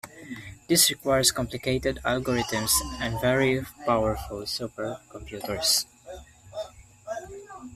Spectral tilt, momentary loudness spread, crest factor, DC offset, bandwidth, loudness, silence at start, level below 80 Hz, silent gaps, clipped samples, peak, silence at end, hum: -3 dB/octave; 19 LU; 24 dB; under 0.1%; 15.5 kHz; -25 LUFS; 0.05 s; -46 dBFS; none; under 0.1%; -4 dBFS; 0 s; none